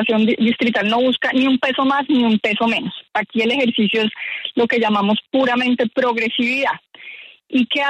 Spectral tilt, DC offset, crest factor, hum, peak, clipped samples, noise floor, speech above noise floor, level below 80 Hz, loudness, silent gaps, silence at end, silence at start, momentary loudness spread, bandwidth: -5.5 dB/octave; under 0.1%; 12 dB; none; -6 dBFS; under 0.1%; -39 dBFS; 22 dB; -64 dBFS; -17 LUFS; none; 0 s; 0 s; 7 LU; 8.8 kHz